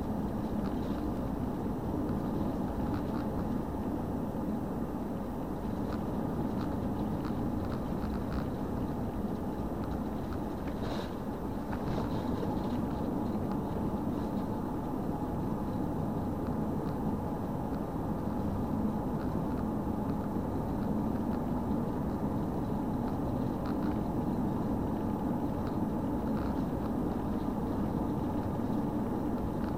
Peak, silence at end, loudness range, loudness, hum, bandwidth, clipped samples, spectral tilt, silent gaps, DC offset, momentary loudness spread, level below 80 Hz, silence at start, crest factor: -20 dBFS; 0 s; 2 LU; -34 LUFS; none; 16 kHz; under 0.1%; -8.5 dB/octave; none; 0.3%; 3 LU; -44 dBFS; 0 s; 14 dB